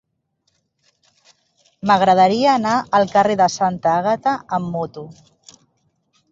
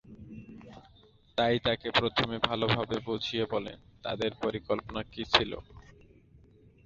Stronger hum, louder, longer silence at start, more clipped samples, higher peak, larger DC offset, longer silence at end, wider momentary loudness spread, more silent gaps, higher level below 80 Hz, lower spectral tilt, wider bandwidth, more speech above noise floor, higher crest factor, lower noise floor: neither; first, -17 LUFS vs -30 LUFS; first, 1.85 s vs 0.05 s; neither; about the same, -2 dBFS vs -4 dBFS; neither; first, 1.2 s vs 0.5 s; second, 13 LU vs 21 LU; neither; about the same, -60 dBFS vs -56 dBFS; about the same, -5 dB/octave vs -5.5 dB/octave; about the same, 7.8 kHz vs 7.8 kHz; first, 53 dB vs 29 dB; second, 18 dB vs 28 dB; first, -70 dBFS vs -60 dBFS